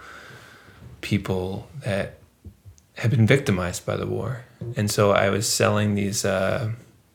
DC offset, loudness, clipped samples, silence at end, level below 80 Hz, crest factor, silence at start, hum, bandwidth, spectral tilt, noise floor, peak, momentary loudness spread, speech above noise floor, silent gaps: under 0.1%; -23 LUFS; under 0.1%; 0.35 s; -52 dBFS; 22 dB; 0 s; none; 18 kHz; -5 dB/octave; -48 dBFS; -2 dBFS; 16 LU; 25 dB; none